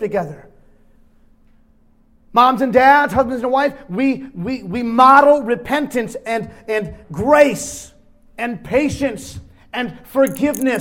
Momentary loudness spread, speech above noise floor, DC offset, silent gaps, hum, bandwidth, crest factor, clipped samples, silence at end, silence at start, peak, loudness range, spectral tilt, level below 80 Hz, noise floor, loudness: 15 LU; 36 dB; under 0.1%; none; none; 18 kHz; 18 dB; under 0.1%; 0 s; 0 s; 0 dBFS; 5 LU; -5 dB/octave; -46 dBFS; -52 dBFS; -16 LUFS